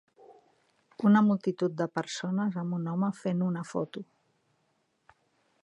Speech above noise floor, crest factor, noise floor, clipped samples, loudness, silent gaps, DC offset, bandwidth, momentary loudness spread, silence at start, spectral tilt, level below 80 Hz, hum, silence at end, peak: 46 dB; 20 dB; -74 dBFS; under 0.1%; -29 LUFS; none; under 0.1%; 9.2 kHz; 11 LU; 0.3 s; -7 dB/octave; -80 dBFS; none; 1.6 s; -12 dBFS